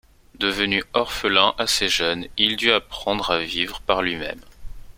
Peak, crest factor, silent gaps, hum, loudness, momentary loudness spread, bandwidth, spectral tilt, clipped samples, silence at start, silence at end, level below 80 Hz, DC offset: 0 dBFS; 22 dB; none; none; -21 LUFS; 8 LU; 16.5 kHz; -2.5 dB/octave; under 0.1%; 0.35 s; 0.05 s; -44 dBFS; under 0.1%